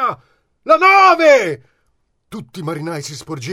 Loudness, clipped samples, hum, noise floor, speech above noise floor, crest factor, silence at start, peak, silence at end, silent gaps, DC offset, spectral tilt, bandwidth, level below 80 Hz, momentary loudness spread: -12 LUFS; under 0.1%; none; -64 dBFS; 50 dB; 16 dB; 0 s; 0 dBFS; 0 s; none; under 0.1%; -4.5 dB/octave; 15.5 kHz; -60 dBFS; 24 LU